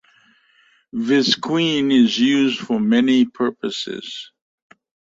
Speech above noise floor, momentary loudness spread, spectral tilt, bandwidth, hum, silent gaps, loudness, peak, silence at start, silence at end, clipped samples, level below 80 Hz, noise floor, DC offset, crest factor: 40 dB; 13 LU; -4.5 dB/octave; 7.8 kHz; none; none; -18 LUFS; -4 dBFS; 0.95 s; 0.9 s; under 0.1%; -62 dBFS; -58 dBFS; under 0.1%; 16 dB